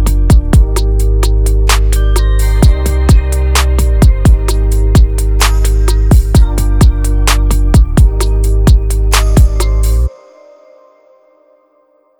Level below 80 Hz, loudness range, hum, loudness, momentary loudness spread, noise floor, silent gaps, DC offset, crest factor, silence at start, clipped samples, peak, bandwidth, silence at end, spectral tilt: -10 dBFS; 3 LU; none; -11 LUFS; 4 LU; -52 dBFS; none; under 0.1%; 8 dB; 0 s; under 0.1%; 0 dBFS; 18 kHz; 2.1 s; -5.5 dB/octave